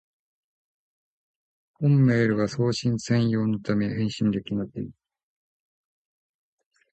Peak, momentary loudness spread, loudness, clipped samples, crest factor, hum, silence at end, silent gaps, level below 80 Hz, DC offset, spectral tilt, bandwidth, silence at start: -10 dBFS; 11 LU; -24 LUFS; under 0.1%; 16 dB; none; 2 s; none; -58 dBFS; under 0.1%; -7 dB/octave; 8.8 kHz; 1.8 s